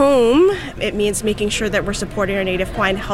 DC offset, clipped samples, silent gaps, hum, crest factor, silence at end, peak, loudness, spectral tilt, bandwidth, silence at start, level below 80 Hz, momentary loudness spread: 0.8%; under 0.1%; none; none; 14 dB; 0 s; -4 dBFS; -18 LUFS; -4.5 dB/octave; 16 kHz; 0 s; -34 dBFS; 9 LU